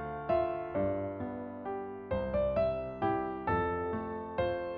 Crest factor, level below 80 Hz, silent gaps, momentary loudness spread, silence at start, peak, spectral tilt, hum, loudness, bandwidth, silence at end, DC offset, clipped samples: 14 dB; -52 dBFS; none; 8 LU; 0 s; -20 dBFS; -6 dB/octave; none; -34 LUFS; 5 kHz; 0 s; under 0.1%; under 0.1%